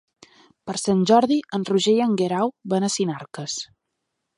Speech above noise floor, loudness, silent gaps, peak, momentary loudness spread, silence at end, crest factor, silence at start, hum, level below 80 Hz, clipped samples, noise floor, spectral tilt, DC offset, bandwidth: 58 dB; -22 LUFS; none; -4 dBFS; 14 LU; 0.75 s; 20 dB; 0.65 s; none; -66 dBFS; under 0.1%; -79 dBFS; -5 dB/octave; under 0.1%; 11 kHz